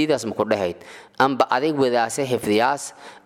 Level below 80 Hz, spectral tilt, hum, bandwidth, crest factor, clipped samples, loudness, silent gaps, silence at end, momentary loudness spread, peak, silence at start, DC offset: -64 dBFS; -4.5 dB/octave; none; 16.5 kHz; 18 dB; under 0.1%; -21 LUFS; none; 0.1 s; 10 LU; -2 dBFS; 0 s; under 0.1%